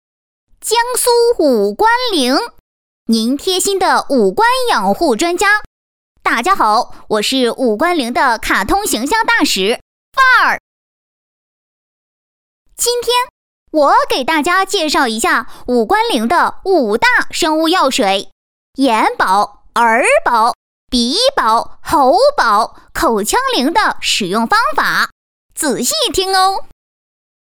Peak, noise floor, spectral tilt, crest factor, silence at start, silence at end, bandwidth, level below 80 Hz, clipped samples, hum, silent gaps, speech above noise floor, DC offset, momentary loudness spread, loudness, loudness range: -2 dBFS; under -90 dBFS; -2 dB/octave; 12 dB; 0.65 s; 0.75 s; over 20 kHz; -42 dBFS; under 0.1%; none; 2.60-3.06 s, 5.66-6.15 s, 9.82-10.12 s, 10.60-12.65 s, 13.30-13.66 s, 18.32-18.73 s, 20.55-20.87 s, 25.12-25.49 s; over 77 dB; under 0.1%; 6 LU; -13 LUFS; 3 LU